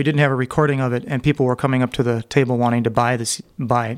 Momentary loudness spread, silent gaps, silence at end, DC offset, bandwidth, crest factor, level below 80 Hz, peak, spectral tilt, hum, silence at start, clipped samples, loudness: 4 LU; none; 0 s; under 0.1%; 15 kHz; 18 dB; -48 dBFS; -2 dBFS; -6 dB/octave; none; 0 s; under 0.1%; -19 LUFS